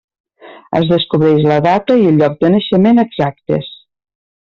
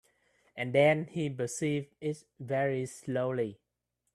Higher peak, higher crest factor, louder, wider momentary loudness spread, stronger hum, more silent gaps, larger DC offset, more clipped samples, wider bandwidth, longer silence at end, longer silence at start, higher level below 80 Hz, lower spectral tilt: first, -2 dBFS vs -12 dBFS; second, 12 dB vs 20 dB; first, -12 LUFS vs -32 LUFS; second, 9 LU vs 12 LU; neither; neither; neither; neither; second, 7 kHz vs 13 kHz; first, 0.85 s vs 0.6 s; about the same, 0.45 s vs 0.55 s; first, -50 dBFS vs -72 dBFS; first, -8.5 dB/octave vs -5.5 dB/octave